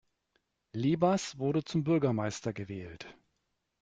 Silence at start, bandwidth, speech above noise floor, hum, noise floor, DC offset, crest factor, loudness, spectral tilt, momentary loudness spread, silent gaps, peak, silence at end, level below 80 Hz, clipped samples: 0.75 s; 9.4 kHz; 50 dB; none; -81 dBFS; under 0.1%; 18 dB; -31 LUFS; -6.5 dB/octave; 16 LU; none; -14 dBFS; 0.7 s; -66 dBFS; under 0.1%